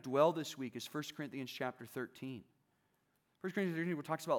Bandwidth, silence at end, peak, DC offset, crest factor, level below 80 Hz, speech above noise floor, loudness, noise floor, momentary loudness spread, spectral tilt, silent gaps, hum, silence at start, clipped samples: 19.5 kHz; 0 s; -16 dBFS; under 0.1%; 22 dB; -88 dBFS; 41 dB; -40 LUFS; -79 dBFS; 14 LU; -5.5 dB/octave; none; none; 0.05 s; under 0.1%